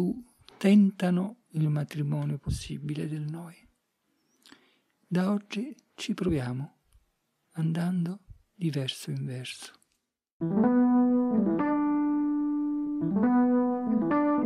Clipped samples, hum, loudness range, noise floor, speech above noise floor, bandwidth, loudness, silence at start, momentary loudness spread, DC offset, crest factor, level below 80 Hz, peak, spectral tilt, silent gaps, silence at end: under 0.1%; none; 9 LU; -79 dBFS; 51 dB; 13 kHz; -28 LUFS; 0 s; 15 LU; under 0.1%; 18 dB; -56 dBFS; -10 dBFS; -7.5 dB/octave; 10.32-10.40 s; 0 s